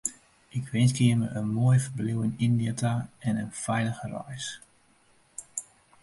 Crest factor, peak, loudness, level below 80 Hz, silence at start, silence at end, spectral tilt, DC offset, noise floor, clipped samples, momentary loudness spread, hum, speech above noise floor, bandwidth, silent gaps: 20 dB; -8 dBFS; -28 LUFS; -60 dBFS; 0.05 s; 0.4 s; -6 dB/octave; under 0.1%; -63 dBFS; under 0.1%; 14 LU; none; 36 dB; 11.5 kHz; none